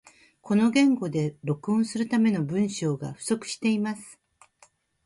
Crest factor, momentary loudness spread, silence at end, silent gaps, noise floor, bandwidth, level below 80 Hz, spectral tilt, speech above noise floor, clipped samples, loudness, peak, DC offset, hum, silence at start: 16 dB; 9 LU; 0.9 s; none; -61 dBFS; 11.5 kHz; -68 dBFS; -6 dB/octave; 36 dB; under 0.1%; -26 LUFS; -10 dBFS; under 0.1%; none; 0.45 s